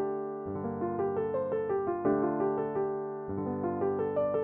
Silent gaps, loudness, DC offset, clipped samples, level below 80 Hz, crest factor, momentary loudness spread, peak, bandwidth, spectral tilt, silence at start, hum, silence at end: none; -32 LUFS; under 0.1%; under 0.1%; -64 dBFS; 14 dB; 7 LU; -16 dBFS; 3.3 kHz; -9 dB/octave; 0 s; none; 0 s